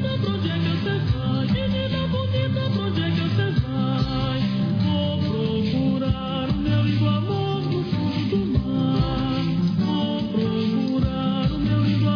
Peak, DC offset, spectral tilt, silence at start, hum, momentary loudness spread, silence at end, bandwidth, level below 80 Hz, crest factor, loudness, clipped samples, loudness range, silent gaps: -8 dBFS; under 0.1%; -8.5 dB/octave; 0 s; none; 2 LU; 0 s; 5.4 kHz; -38 dBFS; 14 dB; -23 LUFS; under 0.1%; 1 LU; none